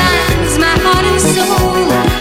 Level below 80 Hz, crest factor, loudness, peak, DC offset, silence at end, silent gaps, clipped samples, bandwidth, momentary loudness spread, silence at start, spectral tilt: -22 dBFS; 12 dB; -11 LUFS; 0 dBFS; under 0.1%; 0 s; none; under 0.1%; 17 kHz; 2 LU; 0 s; -4 dB/octave